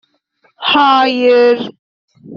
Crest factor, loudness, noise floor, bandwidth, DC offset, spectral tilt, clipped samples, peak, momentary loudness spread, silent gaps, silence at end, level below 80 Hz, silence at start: 12 dB; -11 LUFS; -58 dBFS; 6.8 kHz; under 0.1%; -0.5 dB/octave; under 0.1%; 0 dBFS; 10 LU; 1.79-2.08 s; 0 s; -62 dBFS; 0.6 s